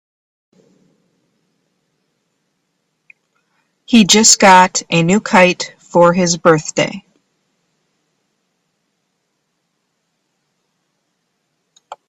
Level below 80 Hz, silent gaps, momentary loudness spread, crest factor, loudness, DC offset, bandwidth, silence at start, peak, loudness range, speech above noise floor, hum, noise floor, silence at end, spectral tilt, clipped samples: -56 dBFS; none; 12 LU; 16 dB; -11 LUFS; under 0.1%; 15.5 kHz; 3.9 s; 0 dBFS; 10 LU; 58 dB; none; -69 dBFS; 0.15 s; -3 dB/octave; under 0.1%